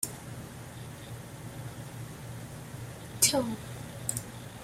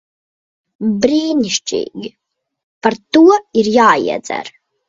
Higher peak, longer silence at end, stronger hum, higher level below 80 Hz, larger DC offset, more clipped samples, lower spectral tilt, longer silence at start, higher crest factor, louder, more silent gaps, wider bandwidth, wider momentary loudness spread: second, -6 dBFS vs 0 dBFS; second, 0 s vs 0.4 s; neither; about the same, -58 dBFS vs -58 dBFS; neither; neither; about the same, -3 dB/octave vs -4 dB/octave; second, 0 s vs 0.8 s; first, 30 dB vs 16 dB; second, -34 LUFS vs -14 LUFS; second, none vs 2.63-2.81 s; first, 16 kHz vs 7.8 kHz; first, 19 LU vs 15 LU